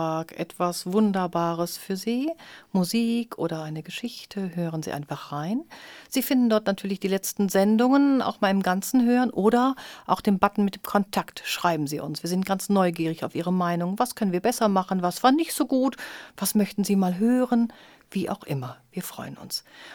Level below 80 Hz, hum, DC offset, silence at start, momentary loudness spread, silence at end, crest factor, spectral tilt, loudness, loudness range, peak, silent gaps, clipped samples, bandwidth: -64 dBFS; none; under 0.1%; 0 s; 12 LU; 0 s; 22 dB; -5.5 dB/octave; -25 LUFS; 6 LU; -4 dBFS; none; under 0.1%; 19.5 kHz